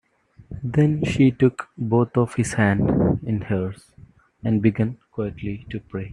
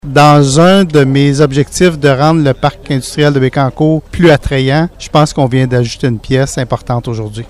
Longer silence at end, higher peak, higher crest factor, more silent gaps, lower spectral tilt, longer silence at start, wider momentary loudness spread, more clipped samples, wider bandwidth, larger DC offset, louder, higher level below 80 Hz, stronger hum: about the same, 0 s vs 0 s; second, -4 dBFS vs 0 dBFS; first, 18 dB vs 10 dB; neither; first, -7.5 dB/octave vs -6 dB/octave; first, 0.4 s vs 0.05 s; first, 13 LU vs 9 LU; second, under 0.1% vs 1%; second, 11 kHz vs 13.5 kHz; neither; second, -22 LUFS vs -10 LUFS; second, -46 dBFS vs -32 dBFS; neither